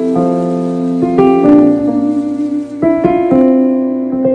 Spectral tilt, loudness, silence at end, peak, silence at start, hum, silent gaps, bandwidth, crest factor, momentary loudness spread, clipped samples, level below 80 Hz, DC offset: -9 dB/octave; -12 LUFS; 0 s; 0 dBFS; 0 s; none; none; 8.8 kHz; 10 dB; 8 LU; 0.4%; -44 dBFS; under 0.1%